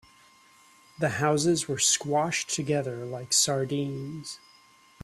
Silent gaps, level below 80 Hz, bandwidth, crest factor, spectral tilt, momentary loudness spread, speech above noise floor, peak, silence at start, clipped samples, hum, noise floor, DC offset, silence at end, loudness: none; -66 dBFS; 15 kHz; 20 dB; -3 dB/octave; 14 LU; 30 dB; -10 dBFS; 1 s; under 0.1%; none; -58 dBFS; under 0.1%; 0.65 s; -26 LUFS